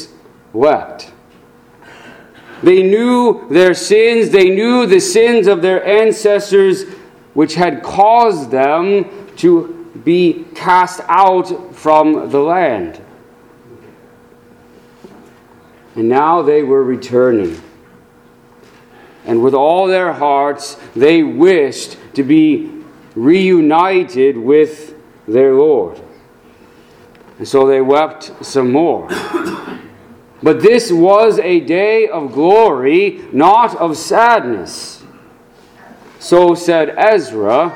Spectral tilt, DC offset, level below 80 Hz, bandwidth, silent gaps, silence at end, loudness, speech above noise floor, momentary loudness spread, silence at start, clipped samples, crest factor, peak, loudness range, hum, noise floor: -5.5 dB/octave; under 0.1%; -56 dBFS; 14.5 kHz; none; 0 s; -12 LUFS; 34 dB; 13 LU; 0 s; 0.1%; 12 dB; 0 dBFS; 6 LU; none; -45 dBFS